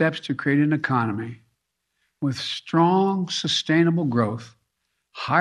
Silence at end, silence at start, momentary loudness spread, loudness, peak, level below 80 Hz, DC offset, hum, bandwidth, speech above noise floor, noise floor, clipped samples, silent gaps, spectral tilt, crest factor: 0 s; 0 s; 11 LU; -22 LUFS; -6 dBFS; -68 dBFS; under 0.1%; none; 11 kHz; 54 dB; -76 dBFS; under 0.1%; none; -5.5 dB/octave; 18 dB